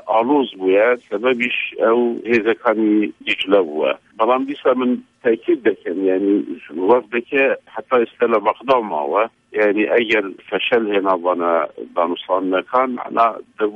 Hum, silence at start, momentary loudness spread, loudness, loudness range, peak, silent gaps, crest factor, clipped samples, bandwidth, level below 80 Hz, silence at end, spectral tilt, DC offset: none; 0.05 s; 5 LU; -18 LUFS; 1 LU; -2 dBFS; none; 16 dB; under 0.1%; 7.6 kHz; -66 dBFS; 0 s; -6.5 dB/octave; under 0.1%